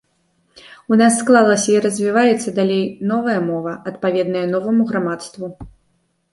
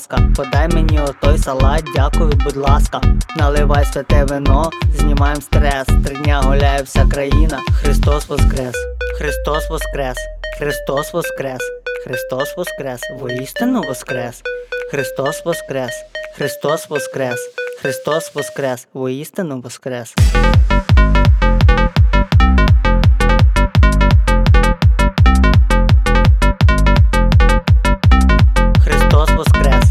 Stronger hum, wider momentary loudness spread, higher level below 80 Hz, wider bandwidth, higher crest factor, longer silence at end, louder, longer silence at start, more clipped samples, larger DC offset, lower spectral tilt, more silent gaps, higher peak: neither; about the same, 12 LU vs 11 LU; second, -54 dBFS vs -16 dBFS; second, 11.5 kHz vs 14 kHz; about the same, 16 dB vs 12 dB; first, 0.65 s vs 0 s; about the same, -17 LUFS vs -15 LUFS; first, 0.9 s vs 0 s; neither; neither; about the same, -5 dB/octave vs -6 dB/octave; neither; about the same, -2 dBFS vs 0 dBFS